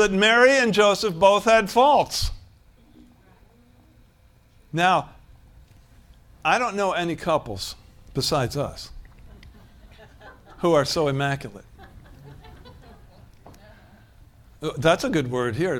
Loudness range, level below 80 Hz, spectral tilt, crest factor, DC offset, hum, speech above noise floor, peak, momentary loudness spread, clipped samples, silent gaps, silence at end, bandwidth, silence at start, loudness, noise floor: 9 LU; -46 dBFS; -4.5 dB/octave; 20 dB; under 0.1%; none; 35 dB; -4 dBFS; 16 LU; under 0.1%; none; 0 s; 18 kHz; 0 s; -21 LUFS; -56 dBFS